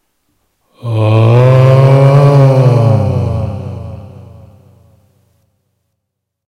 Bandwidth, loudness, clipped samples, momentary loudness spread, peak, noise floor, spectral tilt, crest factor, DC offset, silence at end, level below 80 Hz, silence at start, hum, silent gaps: 6.4 kHz; -8 LUFS; 0.3%; 19 LU; 0 dBFS; -73 dBFS; -9 dB/octave; 10 dB; under 0.1%; 2.4 s; -40 dBFS; 0.85 s; none; none